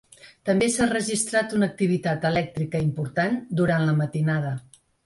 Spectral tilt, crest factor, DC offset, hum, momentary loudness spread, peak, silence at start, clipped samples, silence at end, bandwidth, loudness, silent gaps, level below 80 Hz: -5.5 dB/octave; 16 dB; under 0.1%; none; 5 LU; -8 dBFS; 0.25 s; under 0.1%; 0.45 s; 11.5 kHz; -24 LUFS; none; -56 dBFS